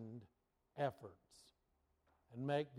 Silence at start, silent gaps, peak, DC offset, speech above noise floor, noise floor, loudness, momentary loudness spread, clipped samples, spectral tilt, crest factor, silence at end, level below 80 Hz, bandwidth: 0 s; none; -26 dBFS; under 0.1%; 38 dB; -82 dBFS; -45 LUFS; 24 LU; under 0.1%; -7 dB/octave; 22 dB; 0 s; -84 dBFS; 14.5 kHz